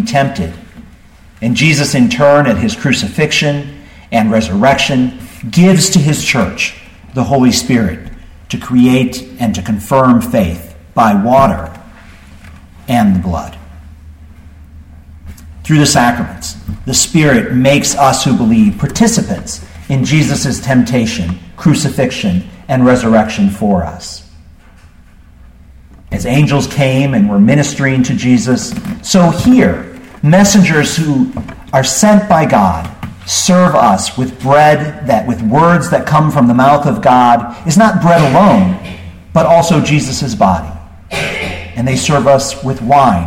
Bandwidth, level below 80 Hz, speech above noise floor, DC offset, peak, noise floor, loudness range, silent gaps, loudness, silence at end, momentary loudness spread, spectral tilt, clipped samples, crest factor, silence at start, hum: 16.5 kHz; -34 dBFS; 29 dB; under 0.1%; 0 dBFS; -39 dBFS; 6 LU; none; -11 LUFS; 0 s; 13 LU; -5 dB/octave; under 0.1%; 12 dB; 0 s; none